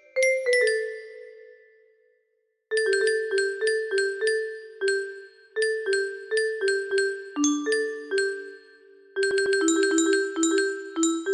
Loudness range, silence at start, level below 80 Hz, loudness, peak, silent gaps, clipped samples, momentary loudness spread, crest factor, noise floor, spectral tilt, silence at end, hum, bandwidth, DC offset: 2 LU; 0.15 s; -72 dBFS; -25 LUFS; -10 dBFS; none; under 0.1%; 13 LU; 16 dB; -73 dBFS; -0.5 dB/octave; 0 s; none; 12.5 kHz; under 0.1%